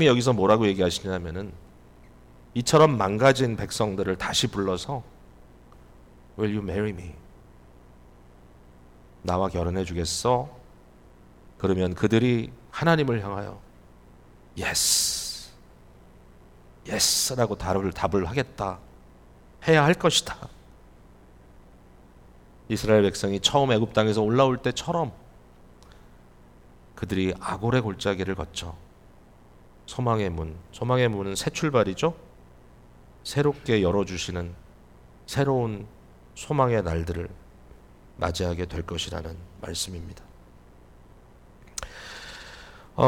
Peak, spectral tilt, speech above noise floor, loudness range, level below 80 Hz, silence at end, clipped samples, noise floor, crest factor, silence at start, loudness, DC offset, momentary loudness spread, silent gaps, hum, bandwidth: -6 dBFS; -4.5 dB/octave; 27 dB; 9 LU; -48 dBFS; 0 s; under 0.1%; -52 dBFS; 20 dB; 0 s; -25 LUFS; under 0.1%; 19 LU; none; 60 Hz at -55 dBFS; 19 kHz